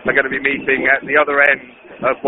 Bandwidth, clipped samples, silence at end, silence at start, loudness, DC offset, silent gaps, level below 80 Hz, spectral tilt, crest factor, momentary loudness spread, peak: 4 kHz; under 0.1%; 0 s; 0 s; -15 LUFS; under 0.1%; none; -50 dBFS; -2 dB/octave; 16 dB; 8 LU; 0 dBFS